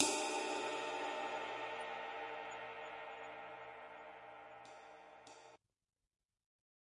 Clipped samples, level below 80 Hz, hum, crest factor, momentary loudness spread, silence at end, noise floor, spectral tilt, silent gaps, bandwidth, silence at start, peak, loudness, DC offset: under 0.1%; -84 dBFS; none; 32 dB; 18 LU; 1.3 s; -65 dBFS; -1 dB/octave; none; 11.5 kHz; 0 s; -14 dBFS; -44 LUFS; under 0.1%